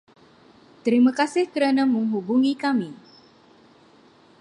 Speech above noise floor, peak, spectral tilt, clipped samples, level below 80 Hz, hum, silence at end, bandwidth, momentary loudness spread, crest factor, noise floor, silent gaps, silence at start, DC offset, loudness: 33 dB; -6 dBFS; -5.5 dB/octave; under 0.1%; -76 dBFS; none; 1.45 s; 11 kHz; 7 LU; 16 dB; -54 dBFS; none; 0.85 s; under 0.1%; -22 LUFS